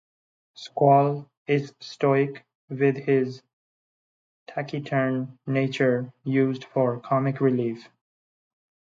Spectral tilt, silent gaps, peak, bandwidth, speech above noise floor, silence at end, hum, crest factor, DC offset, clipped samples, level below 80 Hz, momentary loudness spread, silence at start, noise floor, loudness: -8 dB/octave; 1.37-1.45 s, 2.55-2.68 s, 3.53-4.46 s; -6 dBFS; 7.6 kHz; over 66 dB; 1.15 s; none; 20 dB; under 0.1%; under 0.1%; -74 dBFS; 15 LU; 0.6 s; under -90 dBFS; -24 LUFS